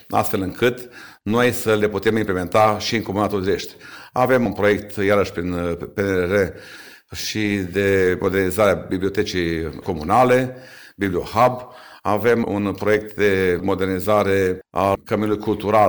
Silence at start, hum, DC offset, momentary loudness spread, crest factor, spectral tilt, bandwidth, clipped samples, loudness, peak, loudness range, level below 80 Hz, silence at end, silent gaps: 0.1 s; none; 0.2%; 10 LU; 16 dB; -5.5 dB/octave; over 20 kHz; under 0.1%; -20 LUFS; -4 dBFS; 2 LU; -46 dBFS; 0 s; none